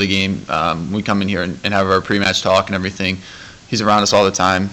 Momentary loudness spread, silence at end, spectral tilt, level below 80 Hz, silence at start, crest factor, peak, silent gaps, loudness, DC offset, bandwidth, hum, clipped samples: 8 LU; 0 s; -4 dB/octave; -48 dBFS; 0 s; 14 dB; -2 dBFS; none; -16 LUFS; under 0.1%; 15.5 kHz; none; under 0.1%